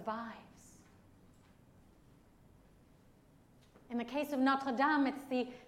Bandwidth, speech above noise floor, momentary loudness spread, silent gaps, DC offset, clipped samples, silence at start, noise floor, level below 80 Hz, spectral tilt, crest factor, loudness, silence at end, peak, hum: 15.5 kHz; 29 dB; 17 LU; none; under 0.1%; under 0.1%; 0 s; -64 dBFS; -72 dBFS; -5 dB/octave; 20 dB; -35 LUFS; 0 s; -20 dBFS; none